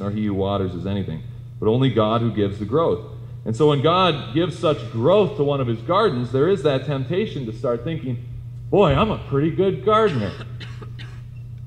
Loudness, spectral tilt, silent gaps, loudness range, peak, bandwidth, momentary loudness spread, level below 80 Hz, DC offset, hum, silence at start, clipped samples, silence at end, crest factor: -21 LUFS; -8 dB/octave; none; 3 LU; -4 dBFS; 9.6 kHz; 17 LU; -44 dBFS; under 0.1%; none; 0 s; under 0.1%; 0 s; 16 dB